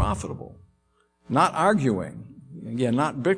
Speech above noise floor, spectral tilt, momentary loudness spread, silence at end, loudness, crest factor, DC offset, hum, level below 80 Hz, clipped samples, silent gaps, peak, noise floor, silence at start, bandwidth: 43 dB; -6.5 dB/octave; 22 LU; 0 s; -24 LUFS; 20 dB; under 0.1%; none; -44 dBFS; under 0.1%; none; -6 dBFS; -67 dBFS; 0 s; 10.5 kHz